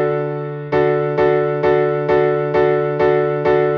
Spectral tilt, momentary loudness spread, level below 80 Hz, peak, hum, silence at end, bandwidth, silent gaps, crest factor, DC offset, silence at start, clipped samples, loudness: -9 dB/octave; 4 LU; -48 dBFS; -4 dBFS; none; 0 s; 5.8 kHz; none; 12 dB; under 0.1%; 0 s; under 0.1%; -17 LUFS